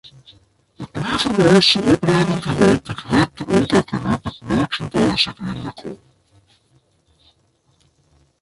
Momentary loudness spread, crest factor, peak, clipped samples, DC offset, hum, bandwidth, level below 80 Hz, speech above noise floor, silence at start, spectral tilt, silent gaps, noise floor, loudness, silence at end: 16 LU; 18 dB; -2 dBFS; under 0.1%; under 0.1%; none; 11.5 kHz; -44 dBFS; 44 dB; 0.8 s; -5.5 dB/octave; none; -61 dBFS; -17 LUFS; 2.45 s